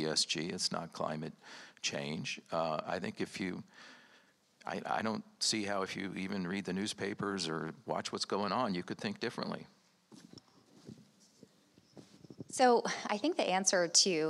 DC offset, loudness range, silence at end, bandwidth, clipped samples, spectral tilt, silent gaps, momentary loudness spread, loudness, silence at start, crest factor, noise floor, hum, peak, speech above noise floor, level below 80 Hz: under 0.1%; 6 LU; 0 s; 13.5 kHz; under 0.1%; -3 dB/octave; none; 19 LU; -35 LUFS; 0 s; 22 dB; -67 dBFS; none; -14 dBFS; 31 dB; -82 dBFS